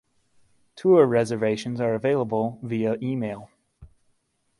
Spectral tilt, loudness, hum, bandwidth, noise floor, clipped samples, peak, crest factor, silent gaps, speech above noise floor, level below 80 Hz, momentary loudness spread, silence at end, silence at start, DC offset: -7.5 dB/octave; -23 LUFS; none; 11.5 kHz; -70 dBFS; under 0.1%; -6 dBFS; 20 dB; none; 47 dB; -60 dBFS; 11 LU; 0.75 s; 0.75 s; under 0.1%